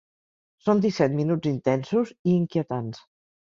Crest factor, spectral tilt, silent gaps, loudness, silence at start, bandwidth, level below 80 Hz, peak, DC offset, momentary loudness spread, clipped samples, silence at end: 18 dB; -8 dB/octave; 2.19-2.25 s; -25 LUFS; 0.65 s; 7.4 kHz; -64 dBFS; -8 dBFS; under 0.1%; 9 LU; under 0.1%; 0.45 s